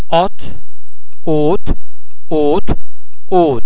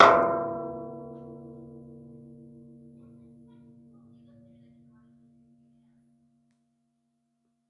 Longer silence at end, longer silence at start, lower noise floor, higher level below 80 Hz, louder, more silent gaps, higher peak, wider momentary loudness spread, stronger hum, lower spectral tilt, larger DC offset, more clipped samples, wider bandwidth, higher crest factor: second, 0 s vs 6.05 s; about the same, 0.1 s vs 0 s; second, -34 dBFS vs -76 dBFS; first, -28 dBFS vs -66 dBFS; first, -16 LUFS vs -27 LUFS; neither; about the same, 0 dBFS vs 0 dBFS; second, 13 LU vs 27 LU; neither; first, -10 dB/octave vs -5 dB/octave; first, 40% vs under 0.1%; neither; second, 4 kHz vs 10 kHz; second, 14 dB vs 30 dB